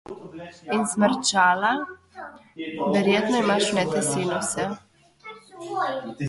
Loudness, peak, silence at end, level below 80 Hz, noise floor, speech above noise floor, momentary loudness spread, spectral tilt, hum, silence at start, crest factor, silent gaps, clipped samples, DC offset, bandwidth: -23 LUFS; -6 dBFS; 0 s; -64 dBFS; -46 dBFS; 22 dB; 21 LU; -3.5 dB/octave; none; 0.1 s; 18 dB; none; under 0.1%; under 0.1%; 11.5 kHz